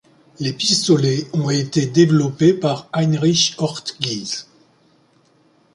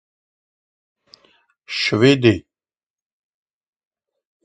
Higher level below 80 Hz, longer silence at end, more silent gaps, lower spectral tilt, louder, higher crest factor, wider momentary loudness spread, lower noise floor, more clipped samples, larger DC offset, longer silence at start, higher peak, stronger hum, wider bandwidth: about the same, -58 dBFS vs -54 dBFS; second, 1.3 s vs 2.05 s; neither; about the same, -5 dB/octave vs -6 dB/octave; about the same, -18 LUFS vs -17 LUFS; about the same, 18 dB vs 22 dB; second, 10 LU vs 13 LU; second, -57 dBFS vs under -90 dBFS; neither; neither; second, 0.4 s vs 1.7 s; about the same, -2 dBFS vs 0 dBFS; neither; first, 11.5 kHz vs 9.4 kHz